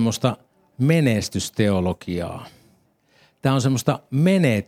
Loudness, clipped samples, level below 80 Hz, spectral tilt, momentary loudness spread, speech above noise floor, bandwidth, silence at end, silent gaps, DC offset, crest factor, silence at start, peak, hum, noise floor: -21 LUFS; under 0.1%; -56 dBFS; -6 dB/octave; 11 LU; 40 dB; 16 kHz; 0.05 s; none; under 0.1%; 18 dB; 0 s; -2 dBFS; none; -60 dBFS